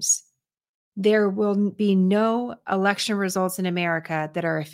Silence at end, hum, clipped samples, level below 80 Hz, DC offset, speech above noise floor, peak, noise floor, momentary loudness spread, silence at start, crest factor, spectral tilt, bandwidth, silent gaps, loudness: 0 s; none; under 0.1%; -72 dBFS; under 0.1%; 44 dB; -6 dBFS; -67 dBFS; 6 LU; 0 s; 18 dB; -4.5 dB/octave; 16.5 kHz; 0.69-0.92 s; -23 LUFS